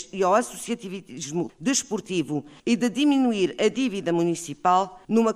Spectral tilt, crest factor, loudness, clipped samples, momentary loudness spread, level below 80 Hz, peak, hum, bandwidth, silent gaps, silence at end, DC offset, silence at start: -4.5 dB/octave; 16 dB; -24 LUFS; under 0.1%; 10 LU; -64 dBFS; -8 dBFS; none; 15 kHz; none; 0 s; under 0.1%; 0 s